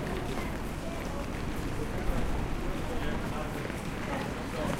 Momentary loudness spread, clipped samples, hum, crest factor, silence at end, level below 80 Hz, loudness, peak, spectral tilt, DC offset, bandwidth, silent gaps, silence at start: 3 LU; under 0.1%; none; 16 dB; 0 s; -38 dBFS; -35 LUFS; -16 dBFS; -5.5 dB/octave; under 0.1%; 16.5 kHz; none; 0 s